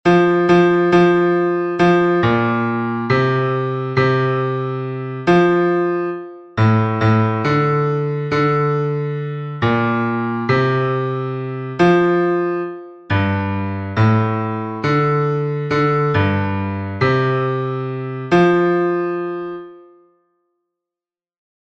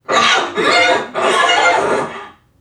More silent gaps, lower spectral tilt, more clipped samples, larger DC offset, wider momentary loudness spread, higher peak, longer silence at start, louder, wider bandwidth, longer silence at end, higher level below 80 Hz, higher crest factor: neither; first, -8 dB/octave vs -1.5 dB/octave; neither; neither; about the same, 11 LU vs 9 LU; about the same, -2 dBFS vs 0 dBFS; about the same, 0.05 s vs 0.1 s; second, -17 LUFS vs -13 LUFS; second, 7.4 kHz vs 13 kHz; first, 1.8 s vs 0.3 s; first, -50 dBFS vs -58 dBFS; about the same, 14 dB vs 14 dB